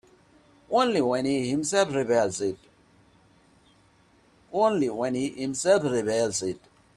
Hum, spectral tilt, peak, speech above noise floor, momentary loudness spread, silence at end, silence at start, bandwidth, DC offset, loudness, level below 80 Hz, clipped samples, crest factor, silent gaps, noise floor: none; -4.5 dB/octave; -10 dBFS; 36 dB; 9 LU; 0.4 s; 0.7 s; 13 kHz; under 0.1%; -25 LUFS; -64 dBFS; under 0.1%; 18 dB; none; -60 dBFS